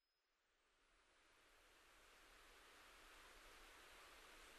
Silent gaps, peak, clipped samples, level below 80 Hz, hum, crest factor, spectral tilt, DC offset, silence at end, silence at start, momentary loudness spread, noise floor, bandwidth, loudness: none; -52 dBFS; under 0.1%; -78 dBFS; none; 16 dB; -1 dB/octave; under 0.1%; 0 s; 0 s; 5 LU; -88 dBFS; 13 kHz; -65 LUFS